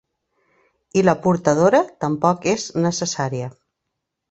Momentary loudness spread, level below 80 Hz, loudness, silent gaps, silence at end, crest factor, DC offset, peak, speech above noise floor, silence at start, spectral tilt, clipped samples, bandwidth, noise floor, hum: 9 LU; -58 dBFS; -19 LUFS; none; 0.8 s; 20 dB; under 0.1%; 0 dBFS; 61 dB; 0.95 s; -5.5 dB/octave; under 0.1%; 8.2 kHz; -79 dBFS; none